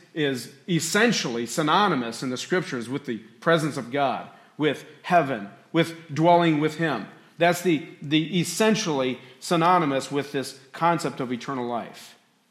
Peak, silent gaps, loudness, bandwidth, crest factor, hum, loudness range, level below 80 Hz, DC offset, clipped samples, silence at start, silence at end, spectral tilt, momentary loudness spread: -6 dBFS; none; -24 LUFS; 16 kHz; 18 dB; none; 3 LU; -74 dBFS; under 0.1%; under 0.1%; 0.15 s; 0.4 s; -4.5 dB/octave; 12 LU